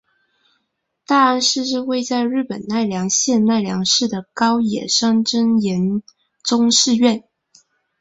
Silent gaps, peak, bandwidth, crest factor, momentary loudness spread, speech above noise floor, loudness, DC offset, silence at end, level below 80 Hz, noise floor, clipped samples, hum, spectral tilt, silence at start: none; -2 dBFS; 8 kHz; 16 dB; 8 LU; 55 dB; -17 LUFS; under 0.1%; 0.8 s; -62 dBFS; -72 dBFS; under 0.1%; none; -3.5 dB/octave; 1.1 s